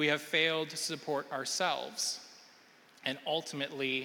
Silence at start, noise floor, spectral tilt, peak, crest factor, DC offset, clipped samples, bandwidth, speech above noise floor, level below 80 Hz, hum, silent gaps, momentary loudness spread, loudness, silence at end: 0 s; -61 dBFS; -2 dB/octave; -14 dBFS; 20 dB; under 0.1%; under 0.1%; 17.5 kHz; 27 dB; -82 dBFS; none; none; 9 LU; -33 LUFS; 0 s